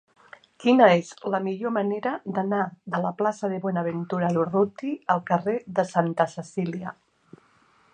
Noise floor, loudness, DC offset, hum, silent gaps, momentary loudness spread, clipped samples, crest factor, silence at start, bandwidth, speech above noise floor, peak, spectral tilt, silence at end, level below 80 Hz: -61 dBFS; -25 LUFS; under 0.1%; none; none; 10 LU; under 0.1%; 22 dB; 0.6 s; 9.6 kHz; 37 dB; -2 dBFS; -7 dB/octave; 1 s; -72 dBFS